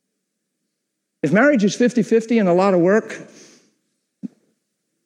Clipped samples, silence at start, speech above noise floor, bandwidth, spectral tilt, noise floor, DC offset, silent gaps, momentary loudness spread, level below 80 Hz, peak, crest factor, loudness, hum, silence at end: under 0.1%; 1.25 s; 61 dB; 11 kHz; -6.5 dB/octave; -77 dBFS; under 0.1%; none; 22 LU; -74 dBFS; -4 dBFS; 16 dB; -17 LUFS; none; 0.8 s